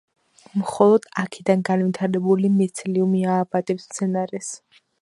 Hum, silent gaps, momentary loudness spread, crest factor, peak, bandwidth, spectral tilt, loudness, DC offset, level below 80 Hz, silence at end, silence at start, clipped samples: none; none; 11 LU; 18 dB; -2 dBFS; 11.5 kHz; -6.5 dB/octave; -21 LUFS; under 0.1%; -68 dBFS; 0.45 s; 0.55 s; under 0.1%